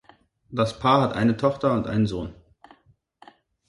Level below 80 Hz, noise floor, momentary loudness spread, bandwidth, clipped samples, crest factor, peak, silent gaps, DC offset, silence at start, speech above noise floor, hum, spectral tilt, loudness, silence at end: -50 dBFS; -61 dBFS; 13 LU; 11.5 kHz; under 0.1%; 20 dB; -6 dBFS; none; under 0.1%; 0.5 s; 39 dB; none; -7 dB/octave; -23 LUFS; 1.35 s